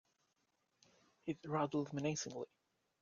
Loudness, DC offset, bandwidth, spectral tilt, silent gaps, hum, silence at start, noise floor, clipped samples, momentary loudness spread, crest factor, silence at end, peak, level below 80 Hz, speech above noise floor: -42 LUFS; under 0.1%; 7.4 kHz; -5 dB/octave; none; none; 1.25 s; -83 dBFS; under 0.1%; 11 LU; 20 dB; 0.55 s; -26 dBFS; -80 dBFS; 42 dB